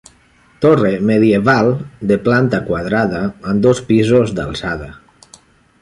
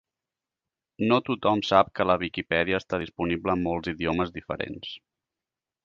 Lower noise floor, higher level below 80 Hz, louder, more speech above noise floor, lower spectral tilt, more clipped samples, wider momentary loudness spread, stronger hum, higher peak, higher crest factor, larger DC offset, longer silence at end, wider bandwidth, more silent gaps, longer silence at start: second, -51 dBFS vs -90 dBFS; first, -42 dBFS vs -52 dBFS; first, -15 LUFS vs -26 LUFS; second, 37 dB vs 64 dB; about the same, -7 dB/octave vs -6.5 dB/octave; neither; about the same, 10 LU vs 12 LU; neither; about the same, -2 dBFS vs -4 dBFS; second, 14 dB vs 24 dB; neither; about the same, 0.85 s vs 0.9 s; first, 11.5 kHz vs 7.4 kHz; neither; second, 0.6 s vs 1 s